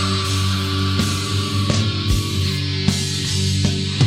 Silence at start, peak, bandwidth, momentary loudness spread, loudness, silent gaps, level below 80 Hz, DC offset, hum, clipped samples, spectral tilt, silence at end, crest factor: 0 s; -2 dBFS; 15.5 kHz; 2 LU; -19 LUFS; none; -34 dBFS; under 0.1%; none; under 0.1%; -4.5 dB/octave; 0 s; 16 dB